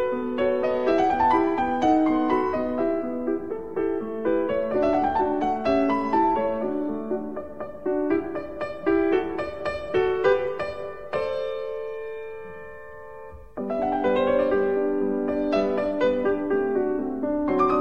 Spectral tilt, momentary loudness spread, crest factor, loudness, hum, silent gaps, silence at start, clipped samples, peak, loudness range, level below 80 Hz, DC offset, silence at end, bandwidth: -7 dB/octave; 13 LU; 16 dB; -24 LUFS; none; none; 0 s; under 0.1%; -8 dBFS; 5 LU; -52 dBFS; 0.7%; 0 s; 7.8 kHz